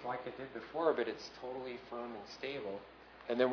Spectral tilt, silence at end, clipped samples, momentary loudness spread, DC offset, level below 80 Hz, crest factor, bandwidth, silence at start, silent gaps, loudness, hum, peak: -3 dB/octave; 0 s; under 0.1%; 12 LU; under 0.1%; -72 dBFS; 22 dB; 5.4 kHz; 0 s; none; -40 LUFS; none; -18 dBFS